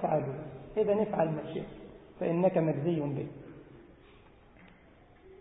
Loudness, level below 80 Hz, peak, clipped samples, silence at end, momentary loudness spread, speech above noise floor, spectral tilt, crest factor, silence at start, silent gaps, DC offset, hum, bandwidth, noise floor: -32 LUFS; -62 dBFS; -14 dBFS; under 0.1%; 0.05 s; 22 LU; 28 dB; -6 dB/octave; 18 dB; 0 s; none; under 0.1%; none; 3.9 kHz; -58 dBFS